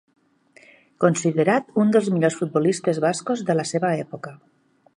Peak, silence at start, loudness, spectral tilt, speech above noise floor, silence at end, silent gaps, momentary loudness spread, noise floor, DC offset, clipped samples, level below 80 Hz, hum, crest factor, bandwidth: -4 dBFS; 1 s; -21 LUFS; -6 dB/octave; 34 dB; 0.6 s; none; 8 LU; -55 dBFS; under 0.1%; under 0.1%; -70 dBFS; none; 18 dB; 11 kHz